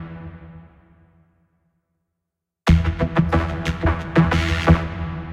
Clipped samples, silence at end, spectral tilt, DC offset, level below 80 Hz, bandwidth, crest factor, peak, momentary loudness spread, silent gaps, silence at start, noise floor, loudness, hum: under 0.1%; 0 s; -7 dB/octave; under 0.1%; -30 dBFS; 9.6 kHz; 20 dB; -2 dBFS; 18 LU; none; 0 s; -82 dBFS; -20 LUFS; none